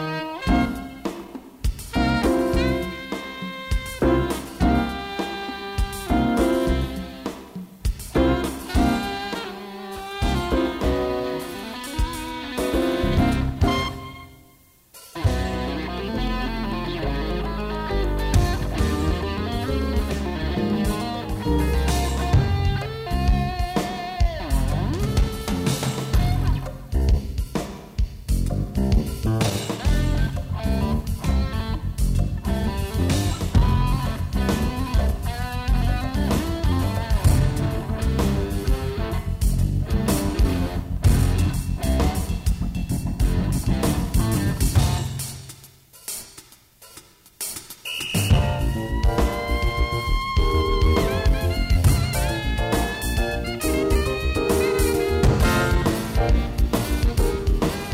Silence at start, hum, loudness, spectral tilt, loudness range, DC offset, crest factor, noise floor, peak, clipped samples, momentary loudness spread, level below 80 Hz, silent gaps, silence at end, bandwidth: 0 s; none; -24 LUFS; -6 dB/octave; 4 LU; under 0.1%; 18 dB; -54 dBFS; -4 dBFS; under 0.1%; 10 LU; -26 dBFS; none; 0 s; 16 kHz